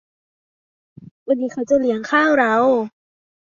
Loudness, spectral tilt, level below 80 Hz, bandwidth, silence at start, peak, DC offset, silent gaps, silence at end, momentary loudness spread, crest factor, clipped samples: -18 LUFS; -5 dB/octave; -62 dBFS; 7.6 kHz; 1 s; -4 dBFS; under 0.1%; 1.11-1.26 s; 0.65 s; 9 LU; 16 dB; under 0.1%